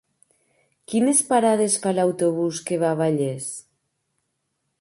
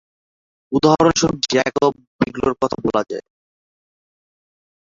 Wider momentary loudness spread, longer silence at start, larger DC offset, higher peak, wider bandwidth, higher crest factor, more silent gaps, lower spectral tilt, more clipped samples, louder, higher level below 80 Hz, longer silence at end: about the same, 9 LU vs 10 LU; first, 0.9 s vs 0.7 s; neither; about the same, -4 dBFS vs -2 dBFS; first, 12 kHz vs 7.6 kHz; about the same, 18 dB vs 20 dB; second, none vs 2.07-2.19 s; about the same, -4.5 dB/octave vs -4.5 dB/octave; neither; second, -21 LUFS vs -18 LUFS; second, -70 dBFS vs -48 dBFS; second, 1.2 s vs 1.75 s